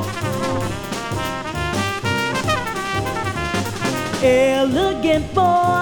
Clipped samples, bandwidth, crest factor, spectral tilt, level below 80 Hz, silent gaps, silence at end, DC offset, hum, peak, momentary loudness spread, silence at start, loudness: under 0.1%; 19.5 kHz; 16 dB; -5 dB/octave; -40 dBFS; none; 0 s; under 0.1%; none; -4 dBFS; 8 LU; 0 s; -20 LUFS